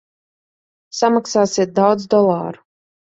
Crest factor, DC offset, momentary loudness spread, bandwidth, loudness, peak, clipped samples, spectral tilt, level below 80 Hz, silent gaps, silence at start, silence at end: 16 dB; under 0.1%; 10 LU; 8.2 kHz; -16 LUFS; -2 dBFS; under 0.1%; -5 dB/octave; -62 dBFS; none; 0.95 s; 0.5 s